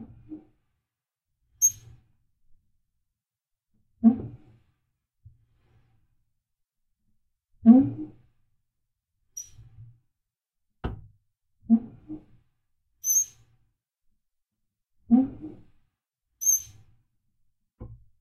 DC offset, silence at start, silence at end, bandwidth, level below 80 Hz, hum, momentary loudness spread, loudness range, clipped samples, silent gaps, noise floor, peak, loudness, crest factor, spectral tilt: under 0.1%; 0 s; 0.25 s; 13.5 kHz; -56 dBFS; none; 26 LU; 7 LU; under 0.1%; none; -87 dBFS; -4 dBFS; -23 LUFS; 26 dB; -5 dB/octave